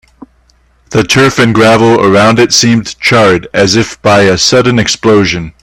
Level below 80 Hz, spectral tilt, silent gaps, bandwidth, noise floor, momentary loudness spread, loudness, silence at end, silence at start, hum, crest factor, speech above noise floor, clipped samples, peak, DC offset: -38 dBFS; -4 dB/octave; none; 18 kHz; -48 dBFS; 4 LU; -7 LUFS; 0.15 s; 0.9 s; none; 8 dB; 41 dB; 0.3%; 0 dBFS; under 0.1%